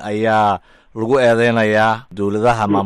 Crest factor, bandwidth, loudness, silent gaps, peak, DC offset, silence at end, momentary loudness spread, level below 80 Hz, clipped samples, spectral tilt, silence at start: 12 dB; 12 kHz; -16 LUFS; none; -4 dBFS; under 0.1%; 0 s; 10 LU; -46 dBFS; under 0.1%; -6.5 dB/octave; 0 s